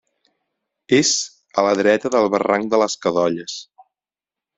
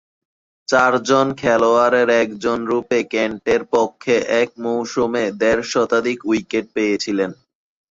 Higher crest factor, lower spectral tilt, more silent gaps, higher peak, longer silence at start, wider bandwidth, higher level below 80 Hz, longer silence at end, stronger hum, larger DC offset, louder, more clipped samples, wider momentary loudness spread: about the same, 20 dB vs 16 dB; second, -3 dB/octave vs -4.5 dB/octave; neither; about the same, -2 dBFS vs -2 dBFS; first, 0.9 s vs 0.7 s; about the same, 8.2 kHz vs 7.8 kHz; second, -62 dBFS vs -54 dBFS; first, 0.95 s vs 0.6 s; neither; neither; about the same, -18 LUFS vs -18 LUFS; neither; about the same, 9 LU vs 7 LU